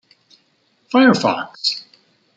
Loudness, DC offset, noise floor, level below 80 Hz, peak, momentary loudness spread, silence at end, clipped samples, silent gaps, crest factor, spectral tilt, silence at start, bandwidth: -17 LUFS; under 0.1%; -62 dBFS; -66 dBFS; -2 dBFS; 8 LU; 0.55 s; under 0.1%; none; 18 dB; -4.5 dB/octave; 0.9 s; 8.8 kHz